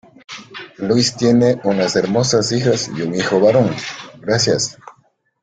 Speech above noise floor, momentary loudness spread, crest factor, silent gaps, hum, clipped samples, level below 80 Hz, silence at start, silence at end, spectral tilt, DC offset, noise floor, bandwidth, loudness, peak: 42 dB; 16 LU; 16 dB; none; none; under 0.1%; -52 dBFS; 0.3 s; 0.5 s; -4.5 dB/octave; under 0.1%; -57 dBFS; 9.4 kHz; -16 LUFS; -2 dBFS